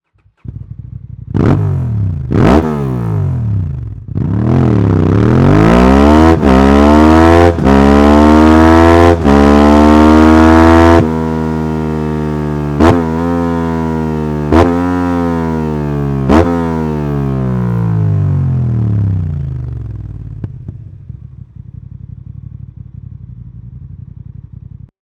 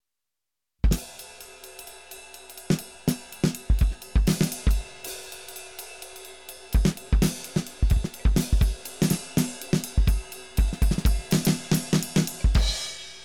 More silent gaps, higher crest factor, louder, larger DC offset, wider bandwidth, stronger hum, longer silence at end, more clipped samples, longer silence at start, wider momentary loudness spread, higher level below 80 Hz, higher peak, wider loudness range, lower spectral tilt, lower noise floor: neither; about the same, 10 dB vs 14 dB; first, -10 LUFS vs -26 LUFS; second, under 0.1% vs 0.2%; second, 12.5 kHz vs 18 kHz; neither; first, 1 s vs 0 s; first, 4% vs under 0.1%; second, 0.5 s vs 0.85 s; first, 20 LU vs 17 LU; first, -22 dBFS vs -28 dBFS; first, 0 dBFS vs -12 dBFS; first, 12 LU vs 4 LU; first, -8 dB/octave vs -5 dB/octave; second, -32 dBFS vs -87 dBFS